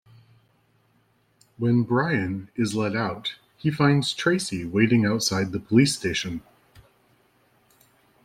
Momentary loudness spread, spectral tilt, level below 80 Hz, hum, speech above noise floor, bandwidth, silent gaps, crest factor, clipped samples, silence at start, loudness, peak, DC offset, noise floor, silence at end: 9 LU; -5 dB/octave; -58 dBFS; none; 42 dB; 15.5 kHz; none; 20 dB; under 0.1%; 1.6 s; -24 LUFS; -6 dBFS; under 0.1%; -65 dBFS; 1.85 s